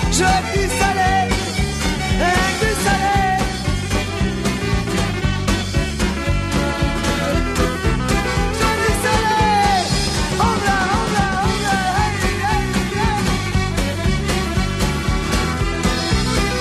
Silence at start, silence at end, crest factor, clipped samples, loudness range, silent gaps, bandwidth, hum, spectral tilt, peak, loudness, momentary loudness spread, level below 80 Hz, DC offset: 0 s; 0 s; 14 dB; under 0.1%; 3 LU; none; 13.5 kHz; none; -4.5 dB/octave; -2 dBFS; -18 LUFS; 4 LU; -24 dBFS; under 0.1%